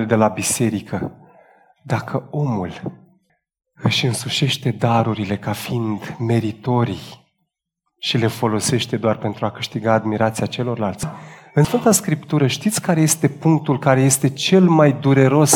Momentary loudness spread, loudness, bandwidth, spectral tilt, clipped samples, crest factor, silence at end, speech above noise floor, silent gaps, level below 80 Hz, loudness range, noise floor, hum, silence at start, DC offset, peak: 11 LU; -19 LUFS; 19 kHz; -5 dB/octave; under 0.1%; 18 dB; 0 s; 58 dB; none; -54 dBFS; 7 LU; -76 dBFS; none; 0 s; under 0.1%; -2 dBFS